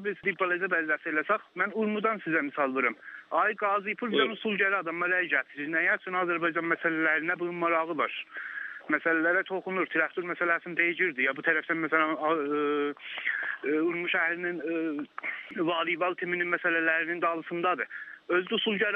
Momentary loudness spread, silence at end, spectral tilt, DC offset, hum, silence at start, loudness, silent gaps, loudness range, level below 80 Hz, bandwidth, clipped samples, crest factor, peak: 6 LU; 0 s; -7.5 dB/octave; under 0.1%; none; 0 s; -28 LUFS; none; 2 LU; -86 dBFS; 4.5 kHz; under 0.1%; 20 dB; -10 dBFS